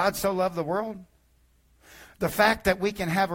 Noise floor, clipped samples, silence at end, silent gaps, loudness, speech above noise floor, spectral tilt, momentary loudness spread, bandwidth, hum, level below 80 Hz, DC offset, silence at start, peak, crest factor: -63 dBFS; under 0.1%; 0 s; none; -26 LUFS; 37 dB; -4.5 dB/octave; 10 LU; 16.5 kHz; none; -50 dBFS; under 0.1%; 0 s; -8 dBFS; 20 dB